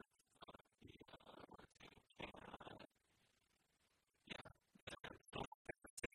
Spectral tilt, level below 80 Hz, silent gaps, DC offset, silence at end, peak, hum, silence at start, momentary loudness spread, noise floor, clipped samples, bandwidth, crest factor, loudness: -3.5 dB/octave; -76 dBFS; 4.82-4.87 s, 5.47-5.65 s, 5.90-5.97 s; under 0.1%; 0.1 s; -34 dBFS; none; 0.3 s; 12 LU; -84 dBFS; under 0.1%; 12.5 kHz; 26 dB; -58 LUFS